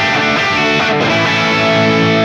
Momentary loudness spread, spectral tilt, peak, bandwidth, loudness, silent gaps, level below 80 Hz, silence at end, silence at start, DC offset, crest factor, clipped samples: 1 LU; -4.5 dB/octave; -2 dBFS; 13 kHz; -11 LUFS; none; -46 dBFS; 0 s; 0 s; under 0.1%; 10 dB; under 0.1%